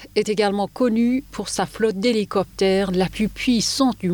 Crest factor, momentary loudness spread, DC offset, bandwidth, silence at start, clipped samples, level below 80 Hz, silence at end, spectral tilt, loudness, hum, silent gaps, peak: 14 dB; 5 LU; under 0.1%; over 20 kHz; 0 s; under 0.1%; -46 dBFS; 0 s; -4.5 dB/octave; -21 LUFS; none; none; -6 dBFS